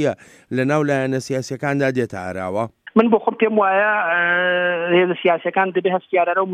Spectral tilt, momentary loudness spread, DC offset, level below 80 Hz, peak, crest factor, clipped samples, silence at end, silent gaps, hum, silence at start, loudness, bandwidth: -6 dB/octave; 9 LU; under 0.1%; -66 dBFS; -2 dBFS; 16 dB; under 0.1%; 0 s; none; none; 0 s; -19 LUFS; 12 kHz